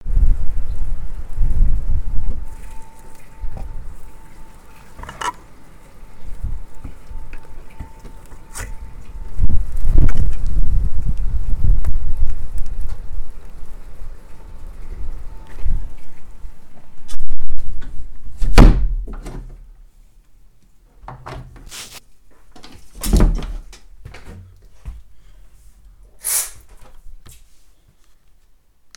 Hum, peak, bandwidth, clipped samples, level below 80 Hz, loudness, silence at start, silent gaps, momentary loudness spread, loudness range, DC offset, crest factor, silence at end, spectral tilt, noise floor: none; 0 dBFS; 15.5 kHz; under 0.1%; -20 dBFS; -24 LUFS; 0.05 s; none; 25 LU; 15 LU; under 0.1%; 14 dB; 1.85 s; -5 dB/octave; -50 dBFS